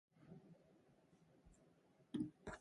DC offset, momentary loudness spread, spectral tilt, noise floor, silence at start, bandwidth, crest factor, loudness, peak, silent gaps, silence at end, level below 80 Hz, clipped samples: under 0.1%; 20 LU; -6.5 dB/octave; -74 dBFS; 0.15 s; 11 kHz; 22 dB; -50 LUFS; -34 dBFS; none; 0 s; -74 dBFS; under 0.1%